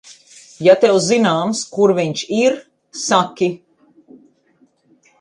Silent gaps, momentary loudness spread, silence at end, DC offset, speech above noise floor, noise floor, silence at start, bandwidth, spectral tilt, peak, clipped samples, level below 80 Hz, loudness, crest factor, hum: none; 12 LU; 1.65 s; under 0.1%; 42 dB; -57 dBFS; 0.1 s; 11 kHz; -4.5 dB/octave; 0 dBFS; under 0.1%; -66 dBFS; -16 LUFS; 18 dB; none